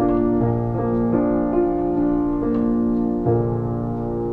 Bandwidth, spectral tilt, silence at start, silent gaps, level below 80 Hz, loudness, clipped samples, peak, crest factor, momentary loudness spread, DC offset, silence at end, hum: 3.2 kHz; -12 dB/octave; 0 s; none; -36 dBFS; -21 LUFS; under 0.1%; -6 dBFS; 12 dB; 5 LU; under 0.1%; 0 s; none